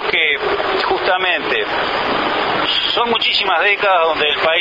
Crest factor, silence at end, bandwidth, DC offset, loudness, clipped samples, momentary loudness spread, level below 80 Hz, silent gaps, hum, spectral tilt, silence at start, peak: 14 dB; 0 s; 7.8 kHz; under 0.1%; -15 LUFS; under 0.1%; 4 LU; -48 dBFS; none; none; -4 dB/octave; 0 s; -2 dBFS